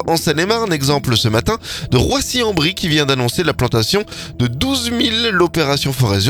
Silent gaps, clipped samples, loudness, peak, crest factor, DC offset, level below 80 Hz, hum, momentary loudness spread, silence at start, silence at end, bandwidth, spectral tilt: none; under 0.1%; -16 LUFS; 0 dBFS; 16 dB; under 0.1%; -36 dBFS; none; 4 LU; 0 s; 0 s; 19 kHz; -4.5 dB/octave